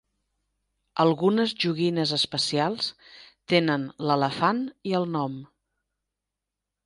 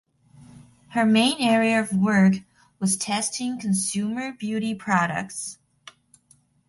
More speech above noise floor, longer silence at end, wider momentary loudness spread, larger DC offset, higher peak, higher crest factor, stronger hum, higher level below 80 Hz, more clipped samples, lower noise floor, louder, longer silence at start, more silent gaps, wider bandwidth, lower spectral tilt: first, 61 dB vs 38 dB; first, 1.4 s vs 1.15 s; second, 8 LU vs 11 LU; neither; about the same, -6 dBFS vs -8 dBFS; about the same, 20 dB vs 16 dB; first, 50 Hz at -55 dBFS vs none; about the same, -68 dBFS vs -64 dBFS; neither; first, -86 dBFS vs -61 dBFS; about the same, -25 LUFS vs -23 LUFS; first, 0.95 s vs 0.4 s; neither; about the same, 11 kHz vs 11.5 kHz; about the same, -5.5 dB/octave vs -4.5 dB/octave